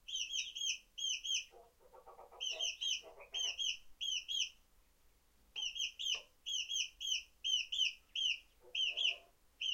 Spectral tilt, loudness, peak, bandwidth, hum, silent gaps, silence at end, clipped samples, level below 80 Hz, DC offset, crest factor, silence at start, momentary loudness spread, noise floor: 3.5 dB/octave; -38 LUFS; -24 dBFS; 16.5 kHz; none; none; 0 s; under 0.1%; -74 dBFS; under 0.1%; 18 dB; 0.1 s; 6 LU; -70 dBFS